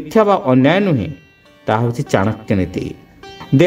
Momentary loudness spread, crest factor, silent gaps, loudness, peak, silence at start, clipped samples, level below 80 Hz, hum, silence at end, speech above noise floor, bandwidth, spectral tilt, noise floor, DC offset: 17 LU; 16 dB; none; -16 LUFS; 0 dBFS; 0 s; under 0.1%; -46 dBFS; none; 0 s; 21 dB; 15.5 kHz; -7.5 dB/octave; -36 dBFS; under 0.1%